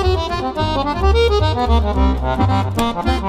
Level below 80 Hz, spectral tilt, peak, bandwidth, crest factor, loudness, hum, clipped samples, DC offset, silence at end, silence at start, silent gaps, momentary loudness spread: -20 dBFS; -6.5 dB/octave; -2 dBFS; 14.5 kHz; 14 dB; -17 LUFS; none; under 0.1%; under 0.1%; 0 s; 0 s; none; 5 LU